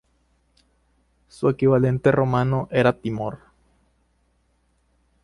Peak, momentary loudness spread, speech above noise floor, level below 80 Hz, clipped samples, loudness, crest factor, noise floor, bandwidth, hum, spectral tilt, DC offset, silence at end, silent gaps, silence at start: -4 dBFS; 11 LU; 46 dB; -52 dBFS; under 0.1%; -21 LUFS; 20 dB; -66 dBFS; 11 kHz; 60 Hz at -50 dBFS; -8.5 dB/octave; under 0.1%; 1.9 s; none; 1.4 s